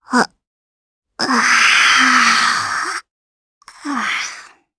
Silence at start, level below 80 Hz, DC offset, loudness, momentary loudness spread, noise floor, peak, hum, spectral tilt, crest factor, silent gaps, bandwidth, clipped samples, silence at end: 0.1 s; -60 dBFS; under 0.1%; -14 LUFS; 15 LU; -37 dBFS; 0 dBFS; none; -0.5 dB/octave; 18 dB; 0.47-1.02 s, 3.11-3.61 s; 11 kHz; under 0.1%; 0.3 s